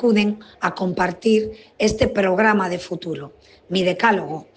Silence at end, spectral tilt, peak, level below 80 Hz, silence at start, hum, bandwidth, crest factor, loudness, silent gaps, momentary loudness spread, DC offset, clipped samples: 0.15 s; -5.5 dB/octave; -4 dBFS; -46 dBFS; 0 s; none; 9.2 kHz; 16 dB; -20 LUFS; none; 12 LU; under 0.1%; under 0.1%